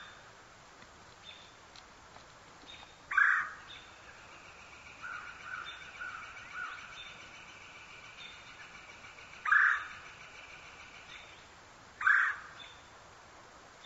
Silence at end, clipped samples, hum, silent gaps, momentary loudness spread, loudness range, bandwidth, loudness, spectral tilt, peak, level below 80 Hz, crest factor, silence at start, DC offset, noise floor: 0 s; under 0.1%; none; none; 27 LU; 12 LU; 8 kHz; -32 LUFS; -1 dB/octave; -14 dBFS; -70 dBFS; 24 dB; 0 s; under 0.1%; -56 dBFS